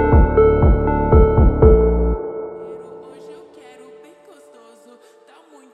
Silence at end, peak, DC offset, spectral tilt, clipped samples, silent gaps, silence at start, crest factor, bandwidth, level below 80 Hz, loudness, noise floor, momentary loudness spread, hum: 2.4 s; 0 dBFS; under 0.1%; -11 dB/octave; under 0.1%; none; 0 s; 16 dB; 3.3 kHz; -20 dBFS; -15 LUFS; -48 dBFS; 22 LU; none